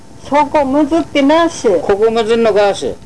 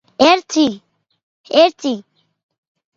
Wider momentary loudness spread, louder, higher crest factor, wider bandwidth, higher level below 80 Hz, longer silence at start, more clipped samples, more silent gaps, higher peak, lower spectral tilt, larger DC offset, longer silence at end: second, 4 LU vs 13 LU; first, -12 LUFS vs -15 LUFS; second, 10 dB vs 18 dB; first, 11 kHz vs 7.8 kHz; first, -42 dBFS vs -62 dBFS; about the same, 0.25 s vs 0.2 s; neither; second, none vs 1.23-1.44 s; about the same, -2 dBFS vs 0 dBFS; first, -4.5 dB/octave vs -3 dB/octave; first, 2% vs under 0.1%; second, 0 s vs 0.95 s